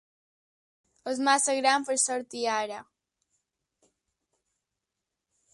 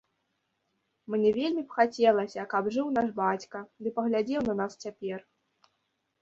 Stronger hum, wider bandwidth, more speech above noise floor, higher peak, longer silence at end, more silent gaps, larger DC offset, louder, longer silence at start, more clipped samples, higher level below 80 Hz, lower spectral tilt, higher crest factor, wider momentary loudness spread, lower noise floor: neither; first, 11.5 kHz vs 7.8 kHz; first, 59 dB vs 50 dB; about the same, -10 dBFS vs -10 dBFS; first, 2.7 s vs 1 s; neither; neither; first, -26 LUFS vs -29 LUFS; about the same, 1.05 s vs 1.1 s; neither; second, -82 dBFS vs -68 dBFS; second, 0 dB/octave vs -6 dB/octave; about the same, 22 dB vs 20 dB; about the same, 13 LU vs 13 LU; first, -86 dBFS vs -78 dBFS